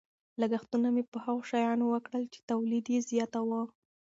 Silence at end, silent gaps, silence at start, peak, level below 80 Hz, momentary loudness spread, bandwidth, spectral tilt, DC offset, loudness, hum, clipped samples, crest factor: 0.45 s; 1.08-1.12 s, 2.43-2.48 s; 0.4 s; -18 dBFS; -80 dBFS; 7 LU; 7.8 kHz; -5.5 dB/octave; under 0.1%; -32 LUFS; none; under 0.1%; 14 dB